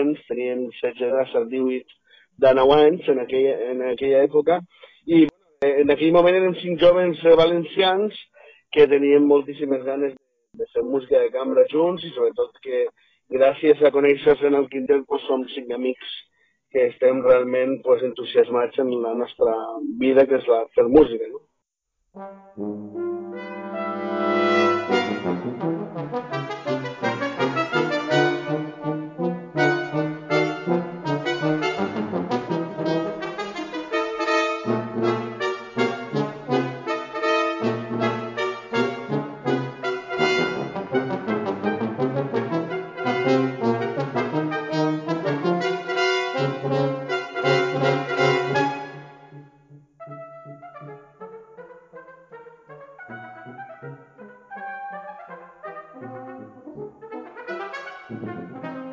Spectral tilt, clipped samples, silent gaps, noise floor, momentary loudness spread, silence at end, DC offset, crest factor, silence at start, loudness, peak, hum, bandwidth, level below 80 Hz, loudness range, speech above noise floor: -6.5 dB/octave; under 0.1%; none; -77 dBFS; 21 LU; 0 s; under 0.1%; 22 dB; 0 s; -22 LUFS; 0 dBFS; none; 7.6 kHz; -60 dBFS; 19 LU; 58 dB